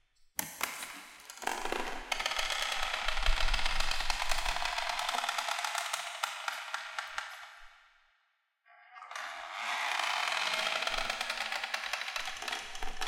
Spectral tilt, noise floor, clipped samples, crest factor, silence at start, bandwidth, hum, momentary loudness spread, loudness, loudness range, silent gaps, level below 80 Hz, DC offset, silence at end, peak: -0.5 dB/octave; -77 dBFS; under 0.1%; 22 dB; 0.4 s; 17 kHz; none; 11 LU; -34 LUFS; 8 LU; none; -42 dBFS; under 0.1%; 0 s; -12 dBFS